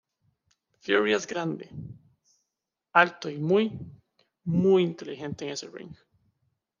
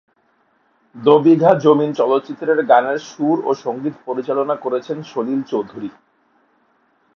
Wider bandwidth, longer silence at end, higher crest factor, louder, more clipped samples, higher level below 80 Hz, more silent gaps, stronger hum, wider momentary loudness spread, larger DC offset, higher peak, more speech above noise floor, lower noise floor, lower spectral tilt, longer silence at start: about the same, 7.4 kHz vs 6.8 kHz; second, 0.85 s vs 1.25 s; first, 24 dB vs 18 dB; second, -26 LUFS vs -17 LUFS; neither; about the same, -68 dBFS vs -68 dBFS; neither; neither; first, 21 LU vs 13 LU; neither; second, -6 dBFS vs 0 dBFS; first, 60 dB vs 45 dB; first, -86 dBFS vs -61 dBFS; second, -5.5 dB/octave vs -7 dB/octave; about the same, 0.85 s vs 0.95 s